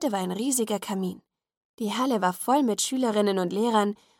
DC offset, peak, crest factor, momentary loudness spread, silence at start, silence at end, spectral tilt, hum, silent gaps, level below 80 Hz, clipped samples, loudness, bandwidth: under 0.1%; -10 dBFS; 18 dB; 7 LU; 0 s; 0.25 s; -4 dB/octave; none; 1.57-1.78 s; -76 dBFS; under 0.1%; -26 LUFS; 17.5 kHz